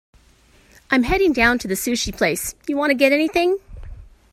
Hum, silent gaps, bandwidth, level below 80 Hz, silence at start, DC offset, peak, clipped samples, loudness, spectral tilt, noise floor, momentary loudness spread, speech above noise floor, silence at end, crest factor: none; none; 16 kHz; -40 dBFS; 0.9 s; under 0.1%; -2 dBFS; under 0.1%; -19 LUFS; -3.5 dB/octave; -53 dBFS; 7 LU; 35 dB; 0.3 s; 20 dB